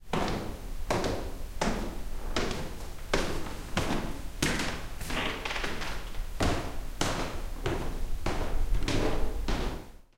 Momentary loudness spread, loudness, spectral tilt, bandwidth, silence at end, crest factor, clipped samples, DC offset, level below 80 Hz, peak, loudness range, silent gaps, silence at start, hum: 9 LU; -34 LUFS; -4.5 dB/octave; 16.5 kHz; 0 s; 22 dB; under 0.1%; 0.2%; -34 dBFS; -8 dBFS; 1 LU; none; 0 s; none